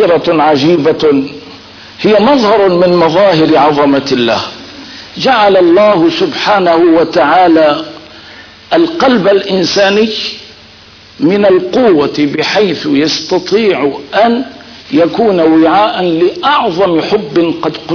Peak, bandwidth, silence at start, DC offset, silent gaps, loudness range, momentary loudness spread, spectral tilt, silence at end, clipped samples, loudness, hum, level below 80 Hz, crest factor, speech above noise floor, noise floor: 0 dBFS; 5.4 kHz; 0 s; under 0.1%; none; 3 LU; 8 LU; -5.5 dB/octave; 0 s; under 0.1%; -9 LUFS; none; -46 dBFS; 10 dB; 28 dB; -36 dBFS